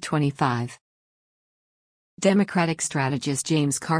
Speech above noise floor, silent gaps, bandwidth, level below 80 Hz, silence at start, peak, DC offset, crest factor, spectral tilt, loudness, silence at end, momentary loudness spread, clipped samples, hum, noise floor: over 67 dB; 0.81-2.17 s; 10.5 kHz; -64 dBFS; 0 s; -6 dBFS; under 0.1%; 18 dB; -5 dB/octave; -24 LUFS; 0 s; 5 LU; under 0.1%; none; under -90 dBFS